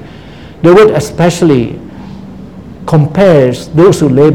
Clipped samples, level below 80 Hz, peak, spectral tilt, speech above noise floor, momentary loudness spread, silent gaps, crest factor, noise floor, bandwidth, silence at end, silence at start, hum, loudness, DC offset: 2%; -36 dBFS; 0 dBFS; -7 dB/octave; 24 dB; 22 LU; none; 8 dB; -30 dBFS; 15.5 kHz; 0 s; 0 s; none; -8 LUFS; 0.8%